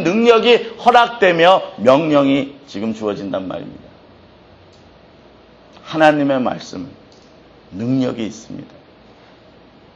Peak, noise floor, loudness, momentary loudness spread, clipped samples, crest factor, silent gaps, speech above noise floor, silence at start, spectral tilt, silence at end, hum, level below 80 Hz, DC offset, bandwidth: 0 dBFS; -46 dBFS; -15 LUFS; 20 LU; under 0.1%; 18 dB; none; 30 dB; 0 s; -5.5 dB/octave; 1.3 s; none; -56 dBFS; under 0.1%; 8.6 kHz